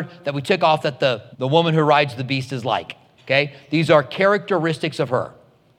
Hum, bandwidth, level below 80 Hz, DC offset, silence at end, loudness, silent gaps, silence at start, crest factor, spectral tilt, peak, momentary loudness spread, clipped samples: none; 12.5 kHz; -68 dBFS; under 0.1%; 0.45 s; -19 LUFS; none; 0 s; 18 dB; -6 dB/octave; -2 dBFS; 9 LU; under 0.1%